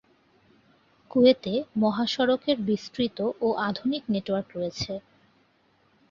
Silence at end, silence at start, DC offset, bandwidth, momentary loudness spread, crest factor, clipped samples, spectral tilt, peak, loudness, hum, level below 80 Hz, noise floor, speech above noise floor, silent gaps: 1.1 s; 1.15 s; under 0.1%; 7.4 kHz; 11 LU; 20 dB; under 0.1%; -6 dB/octave; -6 dBFS; -26 LUFS; none; -62 dBFS; -65 dBFS; 40 dB; none